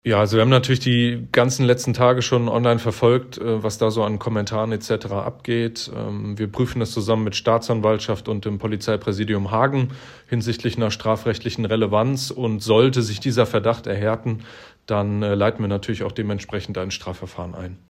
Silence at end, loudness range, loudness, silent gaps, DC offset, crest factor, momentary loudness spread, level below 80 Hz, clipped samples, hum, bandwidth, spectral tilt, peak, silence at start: 0.15 s; 5 LU; -21 LUFS; none; under 0.1%; 18 dB; 10 LU; -50 dBFS; under 0.1%; none; 15 kHz; -6 dB/octave; -2 dBFS; 0.05 s